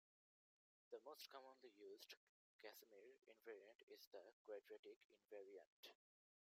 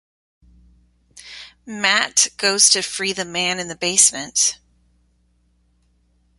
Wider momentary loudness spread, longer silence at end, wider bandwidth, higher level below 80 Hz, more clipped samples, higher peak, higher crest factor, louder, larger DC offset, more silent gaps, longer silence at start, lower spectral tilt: second, 7 LU vs 24 LU; second, 0.45 s vs 1.85 s; about the same, 15.5 kHz vs 16 kHz; second, under -90 dBFS vs -60 dBFS; neither; second, -46 dBFS vs 0 dBFS; about the same, 20 dB vs 22 dB; second, -64 LUFS vs -16 LUFS; neither; first, 2.17-2.59 s, 3.75-3.88 s, 4.07-4.11 s, 4.33-4.45 s, 4.79-4.83 s, 4.96-5.10 s, 5.67-5.83 s vs none; second, 0.9 s vs 1.15 s; about the same, -1 dB/octave vs 0 dB/octave